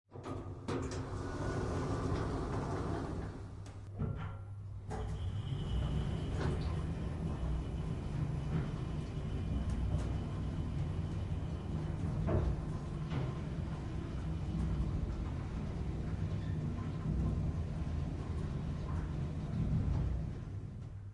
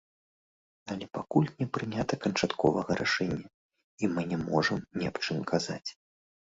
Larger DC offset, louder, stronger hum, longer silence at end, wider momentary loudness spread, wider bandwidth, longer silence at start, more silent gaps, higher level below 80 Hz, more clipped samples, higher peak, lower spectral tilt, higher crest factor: neither; second, -39 LUFS vs -31 LUFS; neither; second, 0 s vs 0.55 s; second, 7 LU vs 11 LU; first, 11 kHz vs 8 kHz; second, 0.1 s vs 0.85 s; second, none vs 3.54-3.69 s, 3.84-3.98 s; first, -44 dBFS vs -60 dBFS; neither; second, -20 dBFS vs -12 dBFS; first, -8 dB/octave vs -5.5 dB/octave; about the same, 18 dB vs 20 dB